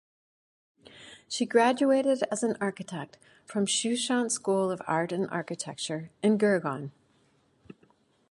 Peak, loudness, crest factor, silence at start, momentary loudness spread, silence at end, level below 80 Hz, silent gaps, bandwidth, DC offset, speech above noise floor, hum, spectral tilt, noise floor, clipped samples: -10 dBFS; -28 LUFS; 18 dB; 0.95 s; 15 LU; 0.6 s; -76 dBFS; none; 11.5 kHz; under 0.1%; 39 dB; none; -4 dB/octave; -67 dBFS; under 0.1%